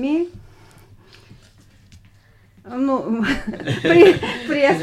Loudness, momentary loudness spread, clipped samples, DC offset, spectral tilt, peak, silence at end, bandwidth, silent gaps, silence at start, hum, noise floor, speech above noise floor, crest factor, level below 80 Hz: -17 LUFS; 14 LU; under 0.1%; under 0.1%; -6 dB/octave; -2 dBFS; 0 s; 12 kHz; none; 0 s; none; -52 dBFS; 35 dB; 18 dB; -46 dBFS